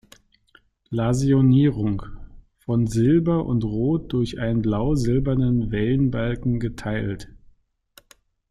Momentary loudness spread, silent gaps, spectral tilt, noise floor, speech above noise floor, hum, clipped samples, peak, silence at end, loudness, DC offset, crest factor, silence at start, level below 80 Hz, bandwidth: 10 LU; none; -8 dB/octave; -59 dBFS; 38 dB; none; under 0.1%; -8 dBFS; 1.2 s; -22 LUFS; under 0.1%; 14 dB; 0.9 s; -38 dBFS; 11.5 kHz